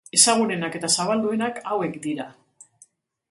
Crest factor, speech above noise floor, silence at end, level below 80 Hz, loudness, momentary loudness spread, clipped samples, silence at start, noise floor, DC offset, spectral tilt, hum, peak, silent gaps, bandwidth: 22 dB; 35 dB; 1 s; -72 dBFS; -22 LUFS; 14 LU; under 0.1%; 0.15 s; -57 dBFS; under 0.1%; -2.5 dB/octave; none; -2 dBFS; none; 12 kHz